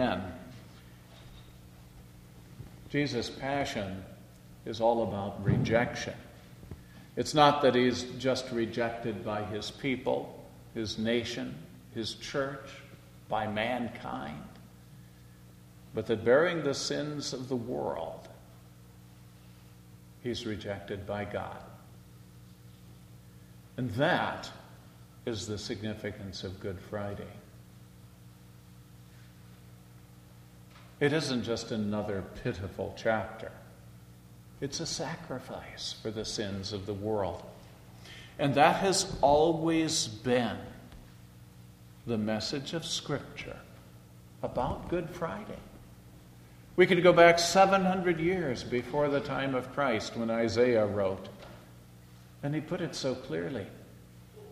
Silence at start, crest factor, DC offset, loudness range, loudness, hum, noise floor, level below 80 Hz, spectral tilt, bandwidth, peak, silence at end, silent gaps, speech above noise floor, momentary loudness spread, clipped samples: 0 s; 26 dB; under 0.1%; 14 LU; -31 LUFS; 60 Hz at -55 dBFS; -53 dBFS; -58 dBFS; -4.5 dB/octave; 15.5 kHz; -6 dBFS; 0 s; none; 23 dB; 24 LU; under 0.1%